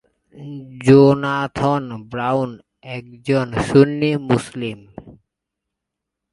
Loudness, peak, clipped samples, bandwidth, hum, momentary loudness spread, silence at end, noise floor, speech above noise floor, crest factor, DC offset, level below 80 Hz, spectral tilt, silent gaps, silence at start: -17 LUFS; 0 dBFS; under 0.1%; 11.5 kHz; none; 21 LU; 1.2 s; -82 dBFS; 64 dB; 18 dB; under 0.1%; -50 dBFS; -7.5 dB/octave; none; 0.35 s